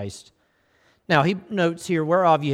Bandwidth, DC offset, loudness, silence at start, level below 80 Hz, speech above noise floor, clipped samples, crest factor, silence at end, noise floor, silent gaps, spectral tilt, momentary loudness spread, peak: 14 kHz; under 0.1%; -21 LUFS; 0 s; -62 dBFS; 42 dB; under 0.1%; 18 dB; 0 s; -64 dBFS; none; -6 dB/octave; 12 LU; -4 dBFS